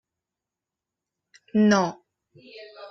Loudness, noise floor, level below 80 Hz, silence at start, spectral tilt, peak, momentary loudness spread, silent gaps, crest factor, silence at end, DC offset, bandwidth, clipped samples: -22 LUFS; -88 dBFS; -68 dBFS; 1.55 s; -6 dB/octave; -8 dBFS; 25 LU; none; 20 dB; 0 s; under 0.1%; 7.2 kHz; under 0.1%